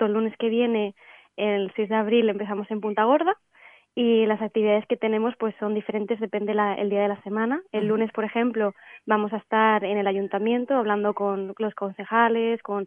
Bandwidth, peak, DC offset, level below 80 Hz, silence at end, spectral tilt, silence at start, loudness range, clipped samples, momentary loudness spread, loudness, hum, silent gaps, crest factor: 3.6 kHz; -6 dBFS; under 0.1%; -80 dBFS; 0 s; -9 dB/octave; 0 s; 2 LU; under 0.1%; 8 LU; -24 LUFS; none; none; 18 dB